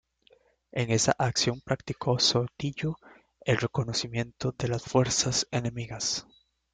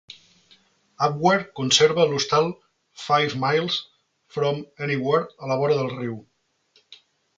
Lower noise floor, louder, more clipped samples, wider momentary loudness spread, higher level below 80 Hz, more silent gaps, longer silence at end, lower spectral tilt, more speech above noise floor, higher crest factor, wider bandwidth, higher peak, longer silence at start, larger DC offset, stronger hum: about the same, -64 dBFS vs -63 dBFS; second, -28 LUFS vs -22 LUFS; neither; second, 10 LU vs 13 LU; first, -56 dBFS vs -64 dBFS; neither; about the same, 0.5 s vs 0.45 s; about the same, -4 dB/octave vs -4 dB/octave; second, 35 dB vs 41 dB; about the same, 22 dB vs 20 dB; about the same, 9.6 kHz vs 9.4 kHz; second, -8 dBFS vs -4 dBFS; second, 0.75 s vs 1 s; neither; neither